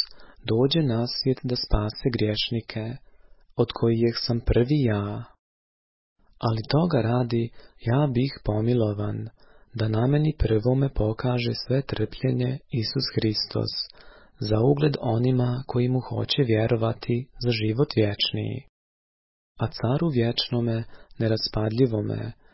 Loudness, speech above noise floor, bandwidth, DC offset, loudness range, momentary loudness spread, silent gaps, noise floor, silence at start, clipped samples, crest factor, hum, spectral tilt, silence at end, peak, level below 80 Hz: -25 LUFS; 27 dB; 5.8 kHz; under 0.1%; 3 LU; 9 LU; 5.39-6.16 s, 18.69-19.55 s; -51 dBFS; 0 s; under 0.1%; 18 dB; none; -10 dB/octave; 0.2 s; -6 dBFS; -42 dBFS